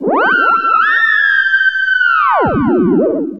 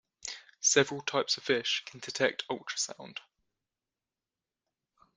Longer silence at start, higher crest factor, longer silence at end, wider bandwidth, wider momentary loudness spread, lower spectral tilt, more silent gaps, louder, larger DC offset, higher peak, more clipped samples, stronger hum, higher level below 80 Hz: second, 0 s vs 0.25 s; second, 10 dB vs 26 dB; second, 0 s vs 1.95 s; second, 7.2 kHz vs 10 kHz; second, 3 LU vs 16 LU; first, -7 dB/octave vs -1.5 dB/octave; neither; first, -11 LUFS vs -30 LUFS; first, 0.5% vs under 0.1%; first, -2 dBFS vs -8 dBFS; neither; neither; first, -42 dBFS vs -78 dBFS